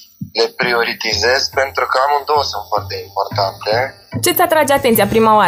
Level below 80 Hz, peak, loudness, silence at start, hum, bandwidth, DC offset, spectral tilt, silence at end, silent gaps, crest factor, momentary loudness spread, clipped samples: -46 dBFS; 0 dBFS; -15 LUFS; 0 s; none; 16 kHz; under 0.1%; -3.5 dB/octave; 0 s; none; 14 dB; 9 LU; under 0.1%